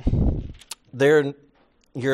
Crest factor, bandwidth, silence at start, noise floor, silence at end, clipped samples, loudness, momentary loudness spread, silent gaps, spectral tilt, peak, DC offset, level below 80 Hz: 16 dB; 13.5 kHz; 0 s; -60 dBFS; 0 s; under 0.1%; -22 LUFS; 20 LU; none; -6.5 dB/octave; -6 dBFS; under 0.1%; -32 dBFS